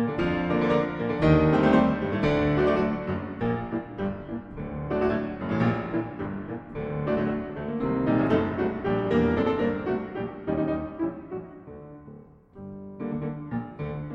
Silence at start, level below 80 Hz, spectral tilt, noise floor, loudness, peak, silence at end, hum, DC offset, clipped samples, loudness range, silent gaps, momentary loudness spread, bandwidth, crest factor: 0 s; -44 dBFS; -9 dB/octave; -48 dBFS; -27 LUFS; -8 dBFS; 0 s; none; under 0.1%; under 0.1%; 10 LU; none; 15 LU; 7.4 kHz; 18 dB